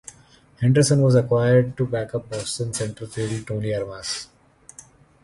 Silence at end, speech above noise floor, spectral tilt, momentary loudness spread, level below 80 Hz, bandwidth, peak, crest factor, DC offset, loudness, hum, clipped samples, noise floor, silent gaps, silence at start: 1 s; 32 dB; -6 dB/octave; 12 LU; -52 dBFS; 11.5 kHz; -6 dBFS; 18 dB; under 0.1%; -22 LUFS; none; under 0.1%; -53 dBFS; none; 0.6 s